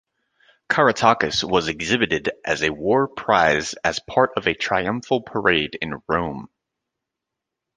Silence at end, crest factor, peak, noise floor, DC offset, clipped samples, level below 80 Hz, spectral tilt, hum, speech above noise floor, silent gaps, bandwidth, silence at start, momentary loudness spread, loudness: 1.3 s; 20 dB; -2 dBFS; -84 dBFS; under 0.1%; under 0.1%; -50 dBFS; -4 dB/octave; none; 63 dB; none; 10 kHz; 0.7 s; 7 LU; -20 LUFS